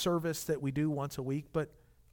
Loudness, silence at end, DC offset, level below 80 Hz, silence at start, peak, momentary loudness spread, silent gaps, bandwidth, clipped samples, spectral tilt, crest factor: -35 LUFS; 0.45 s; under 0.1%; -60 dBFS; 0 s; -20 dBFS; 5 LU; none; 18.5 kHz; under 0.1%; -6 dB/octave; 16 dB